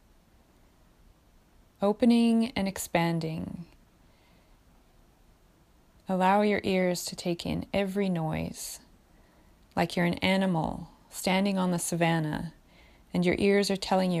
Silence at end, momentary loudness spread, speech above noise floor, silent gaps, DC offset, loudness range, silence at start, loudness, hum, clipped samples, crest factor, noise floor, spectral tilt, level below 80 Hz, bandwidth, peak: 0 s; 14 LU; 34 dB; none; under 0.1%; 4 LU; 1.8 s; -28 LUFS; none; under 0.1%; 20 dB; -61 dBFS; -5.5 dB/octave; -56 dBFS; 15.5 kHz; -10 dBFS